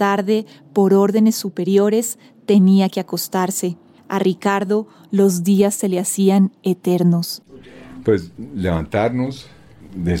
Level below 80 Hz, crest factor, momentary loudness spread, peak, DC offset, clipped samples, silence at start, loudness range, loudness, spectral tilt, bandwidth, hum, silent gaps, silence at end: -48 dBFS; 14 dB; 12 LU; -4 dBFS; under 0.1%; under 0.1%; 0 s; 4 LU; -18 LUFS; -6 dB/octave; 17 kHz; none; none; 0 s